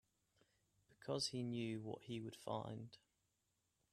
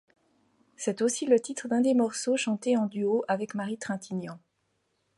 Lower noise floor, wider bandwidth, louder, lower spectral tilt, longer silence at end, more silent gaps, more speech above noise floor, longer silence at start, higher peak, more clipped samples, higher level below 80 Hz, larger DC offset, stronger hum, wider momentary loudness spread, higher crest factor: first, -86 dBFS vs -75 dBFS; first, 13.5 kHz vs 11.5 kHz; second, -47 LUFS vs -28 LUFS; about the same, -5 dB/octave vs -4.5 dB/octave; first, 0.95 s vs 0.8 s; neither; second, 40 dB vs 48 dB; about the same, 0.9 s vs 0.8 s; second, -30 dBFS vs -10 dBFS; neither; about the same, -82 dBFS vs -78 dBFS; neither; neither; about the same, 12 LU vs 10 LU; about the same, 20 dB vs 18 dB